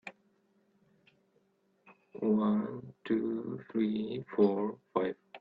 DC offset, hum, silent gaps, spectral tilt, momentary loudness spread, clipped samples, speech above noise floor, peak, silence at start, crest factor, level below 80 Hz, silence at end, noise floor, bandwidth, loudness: under 0.1%; none; none; -9.5 dB/octave; 11 LU; under 0.1%; 41 dB; -14 dBFS; 0.05 s; 20 dB; -76 dBFS; 0.05 s; -73 dBFS; 5.2 kHz; -33 LUFS